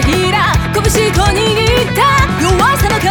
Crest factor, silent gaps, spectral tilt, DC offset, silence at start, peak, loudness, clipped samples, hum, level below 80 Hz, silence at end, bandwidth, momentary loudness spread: 10 dB; none; -4.5 dB/octave; under 0.1%; 0 s; 0 dBFS; -11 LUFS; under 0.1%; none; -20 dBFS; 0 s; over 20 kHz; 2 LU